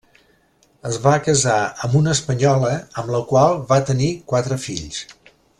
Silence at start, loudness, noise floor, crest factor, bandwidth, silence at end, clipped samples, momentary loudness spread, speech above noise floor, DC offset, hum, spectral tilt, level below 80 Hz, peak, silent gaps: 0.85 s; -19 LUFS; -58 dBFS; 16 dB; 11.5 kHz; 0.5 s; under 0.1%; 12 LU; 40 dB; under 0.1%; none; -5 dB/octave; -50 dBFS; -2 dBFS; none